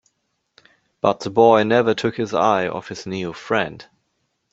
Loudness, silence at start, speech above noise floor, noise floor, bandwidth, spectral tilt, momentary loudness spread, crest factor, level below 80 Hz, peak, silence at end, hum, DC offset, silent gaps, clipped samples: -19 LUFS; 1.05 s; 53 dB; -72 dBFS; 8 kHz; -5.5 dB/octave; 14 LU; 18 dB; -60 dBFS; -2 dBFS; 0.7 s; none; under 0.1%; none; under 0.1%